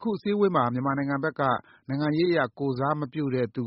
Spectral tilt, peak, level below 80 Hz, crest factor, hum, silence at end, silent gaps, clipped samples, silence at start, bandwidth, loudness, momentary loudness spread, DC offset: -6 dB/octave; -8 dBFS; -64 dBFS; 18 dB; none; 0 s; none; under 0.1%; 0 s; 5.8 kHz; -26 LUFS; 5 LU; under 0.1%